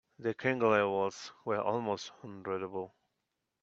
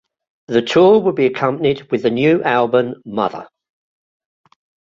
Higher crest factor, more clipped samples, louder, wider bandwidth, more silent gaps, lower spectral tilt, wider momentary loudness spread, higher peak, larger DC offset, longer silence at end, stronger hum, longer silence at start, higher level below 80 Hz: first, 22 dB vs 16 dB; neither; second, -33 LUFS vs -16 LUFS; about the same, 7.8 kHz vs 7.6 kHz; neither; about the same, -5.5 dB/octave vs -6.5 dB/octave; first, 15 LU vs 10 LU; second, -12 dBFS vs -2 dBFS; neither; second, 0.75 s vs 1.45 s; neither; second, 0.2 s vs 0.5 s; second, -76 dBFS vs -58 dBFS